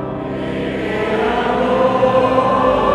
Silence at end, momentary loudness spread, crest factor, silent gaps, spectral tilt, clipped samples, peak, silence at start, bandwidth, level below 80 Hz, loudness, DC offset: 0 s; 8 LU; 14 dB; none; -7 dB/octave; under 0.1%; -2 dBFS; 0 s; 10.5 kHz; -38 dBFS; -16 LUFS; under 0.1%